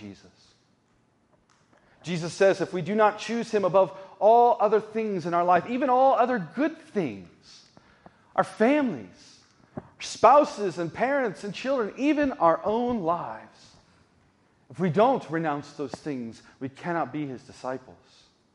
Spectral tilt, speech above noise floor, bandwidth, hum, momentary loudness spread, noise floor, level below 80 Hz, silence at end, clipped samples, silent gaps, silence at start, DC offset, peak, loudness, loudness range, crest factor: -6 dB/octave; 41 dB; 11 kHz; none; 17 LU; -66 dBFS; -66 dBFS; 0.65 s; under 0.1%; none; 0 s; under 0.1%; -4 dBFS; -25 LUFS; 7 LU; 22 dB